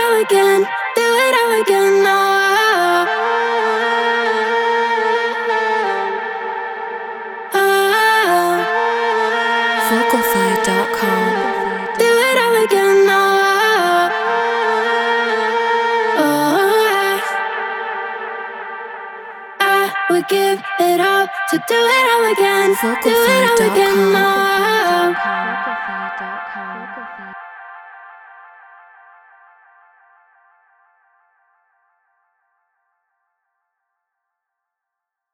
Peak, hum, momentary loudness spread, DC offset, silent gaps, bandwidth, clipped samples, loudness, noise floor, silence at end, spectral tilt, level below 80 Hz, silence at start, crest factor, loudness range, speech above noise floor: -2 dBFS; none; 14 LU; under 0.1%; none; 19.5 kHz; under 0.1%; -15 LUFS; -82 dBFS; 6.9 s; -3 dB/octave; -62 dBFS; 0 s; 16 dB; 6 LU; 68 dB